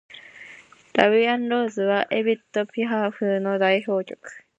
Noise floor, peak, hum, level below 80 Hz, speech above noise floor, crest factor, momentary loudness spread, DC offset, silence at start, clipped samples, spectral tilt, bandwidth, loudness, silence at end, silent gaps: -48 dBFS; 0 dBFS; none; -72 dBFS; 26 dB; 22 dB; 22 LU; under 0.1%; 0.1 s; under 0.1%; -6 dB/octave; 8.2 kHz; -22 LUFS; 0.2 s; none